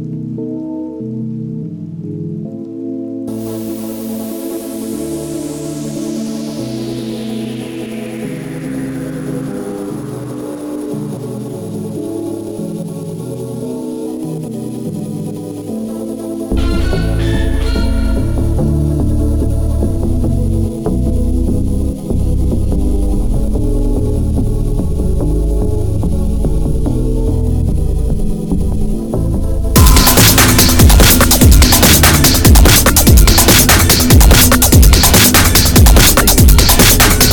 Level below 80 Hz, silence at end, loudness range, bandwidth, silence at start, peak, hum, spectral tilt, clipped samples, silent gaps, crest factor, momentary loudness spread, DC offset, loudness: -16 dBFS; 0 s; 16 LU; 19.5 kHz; 0 s; 0 dBFS; none; -4 dB/octave; under 0.1%; none; 12 dB; 17 LU; under 0.1%; -12 LUFS